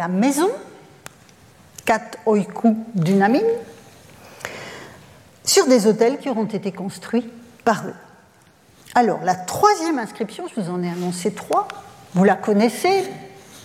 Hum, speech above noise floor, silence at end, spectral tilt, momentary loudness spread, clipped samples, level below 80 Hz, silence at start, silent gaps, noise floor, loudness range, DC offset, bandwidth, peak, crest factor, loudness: none; 33 dB; 0.05 s; -5 dB/octave; 17 LU; under 0.1%; -64 dBFS; 0 s; none; -52 dBFS; 2 LU; under 0.1%; 16.5 kHz; -2 dBFS; 18 dB; -20 LUFS